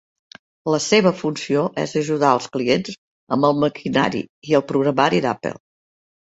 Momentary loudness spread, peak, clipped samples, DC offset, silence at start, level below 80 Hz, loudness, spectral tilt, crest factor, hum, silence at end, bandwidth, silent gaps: 11 LU; -2 dBFS; under 0.1%; under 0.1%; 0.65 s; -60 dBFS; -20 LUFS; -5 dB/octave; 18 dB; none; 0.75 s; 8 kHz; 2.98-3.27 s, 4.30-4.42 s